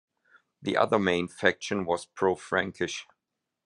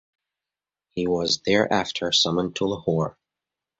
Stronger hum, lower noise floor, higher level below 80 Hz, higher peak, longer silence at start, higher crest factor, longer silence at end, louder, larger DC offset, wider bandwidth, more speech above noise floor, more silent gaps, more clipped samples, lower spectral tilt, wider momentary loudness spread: neither; second, -85 dBFS vs -90 dBFS; second, -70 dBFS vs -56 dBFS; about the same, -6 dBFS vs -6 dBFS; second, 0.6 s vs 0.95 s; about the same, 24 dB vs 20 dB; about the same, 0.65 s vs 0.7 s; second, -28 LUFS vs -23 LUFS; neither; first, 11.5 kHz vs 8.2 kHz; second, 57 dB vs 67 dB; neither; neither; about the same, -4.5 dB/octave vs -4 dB/octave; about the same, 9 LU vs 8 LU